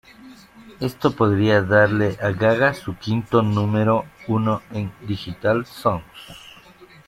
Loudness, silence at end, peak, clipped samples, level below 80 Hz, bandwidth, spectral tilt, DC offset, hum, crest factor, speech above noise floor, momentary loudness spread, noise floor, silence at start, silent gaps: -21 LUFS; 0.2 s; -4 dBFS; under 0.1%; -52 dBFS; 14 kHz; -7.5 dB/octave; under 0.1%; none; 18 dB; 27 dB; 13 LU; -47 dBFS; 0.25 s; none